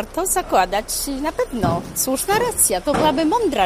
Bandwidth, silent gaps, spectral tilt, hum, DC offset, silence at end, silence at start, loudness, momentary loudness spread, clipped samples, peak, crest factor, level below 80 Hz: 15.5 kHz; none; -3 dB/octave; none; under 0.1%; 0 s; 0 s; -19 LUFS; 7 LU; under 0.1%; -2 dBFS; 16 dB; -38 dBFS